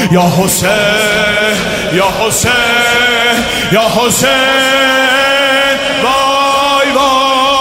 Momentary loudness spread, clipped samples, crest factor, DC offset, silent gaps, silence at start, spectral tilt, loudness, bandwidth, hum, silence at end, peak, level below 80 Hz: 3 LU; under 0.1%; 10 dB; under 0.1%; none; 0 s; -3 dB/octave; -9 LUFS; 16.5 kHz; none; 0 s; 0 dBFS; -36 dBFS